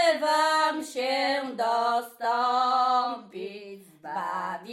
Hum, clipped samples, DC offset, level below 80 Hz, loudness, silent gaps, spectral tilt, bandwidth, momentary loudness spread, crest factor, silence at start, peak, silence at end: none; under 0.1%; under 0.1%; -82 dBFS; -26 LUFS; none; -2.5 dB/octave; 16 kHz; 16 LU; 16 dB; 0 s; -12 dBFS; 0 s